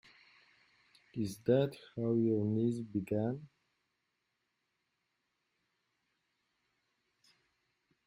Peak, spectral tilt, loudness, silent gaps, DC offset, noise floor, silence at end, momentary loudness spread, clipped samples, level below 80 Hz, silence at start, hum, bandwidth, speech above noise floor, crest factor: -18 dBFS; -8 dB/octave; -35 LUFS; none; under 0.1%; -84 dBFS; 4.6 s; 9 LU; under 0.1%; -76 dBFS; 1.15 s; none; 15.5 kHz; 50 dB; 22 dB